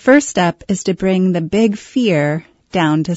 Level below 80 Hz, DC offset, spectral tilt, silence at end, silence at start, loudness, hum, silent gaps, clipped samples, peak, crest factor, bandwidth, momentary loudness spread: -50 dBFS; under 0.1%; -5.5 dB/octave; 0 s; 0.05 s; -16 LUFS; none; none; under 0.1%; 0 dBFS; 14 dB; 8 kHz; 7 LU